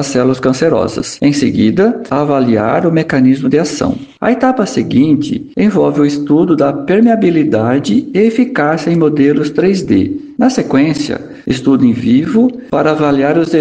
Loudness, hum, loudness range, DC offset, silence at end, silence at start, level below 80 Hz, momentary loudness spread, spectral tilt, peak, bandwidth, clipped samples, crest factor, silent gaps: -12 LUFS; none; 1 LU; 0.1%; 0 s; 0 s; -46 dBFS; 5 LU; -6.5 dB/octave; 0 dBFS; 9.4 kHz; under 0.1%; 10 dB; none